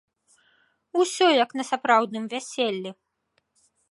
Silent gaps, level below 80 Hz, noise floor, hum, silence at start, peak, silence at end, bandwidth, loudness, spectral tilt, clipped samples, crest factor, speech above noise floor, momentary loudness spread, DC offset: none; -82 dBFS; -73 dBFS; none; 0.95 s; -6 dBFS; 1 s; 11.5 kHz; -24 LUFS; -3 dB/octave; under 0.1%; 20 dB; 50 dB; 12 LU; under 0.1%